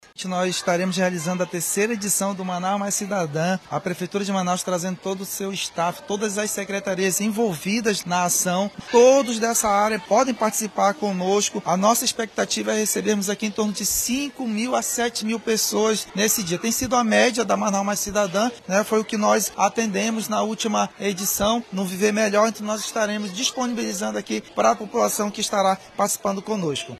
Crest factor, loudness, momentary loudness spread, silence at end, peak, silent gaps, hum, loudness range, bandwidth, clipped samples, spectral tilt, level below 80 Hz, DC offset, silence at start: 18 dB; -22 LUFS; 7 LU; 0 s; -4 dBFS; none; none; 5 LU; 13.5 kHz; under 0.1%; -3.5 dB/octave; -56 dBFS; under 0.1%; 0.2 s